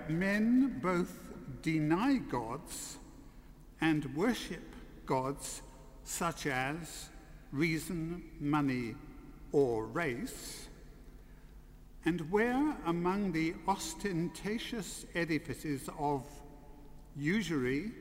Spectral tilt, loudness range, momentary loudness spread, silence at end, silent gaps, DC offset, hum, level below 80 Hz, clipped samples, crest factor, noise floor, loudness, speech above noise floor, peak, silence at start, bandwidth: -5.5 dB/octave; 3 LU; 17 LU; 0 s; none; under 0.1%; none; -54 dBFS; under 0.1%; 18 dB; -54 dBFS; -35 LUFS; 20 dB; -18 dBFS; 0 s; 16 kHz